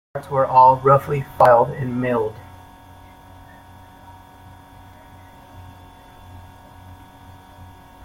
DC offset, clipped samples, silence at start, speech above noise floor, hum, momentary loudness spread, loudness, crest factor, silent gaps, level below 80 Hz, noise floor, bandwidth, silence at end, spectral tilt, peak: under 0.1%; under 0.1%; 0.15 s; 28 dB; none; 13 LU; -17 LUFS; 20 dB; none; -52 dBFS; -44 dBFS; 16.5 kHz; 0.4 s; -8 dB/octave; -2 dBFS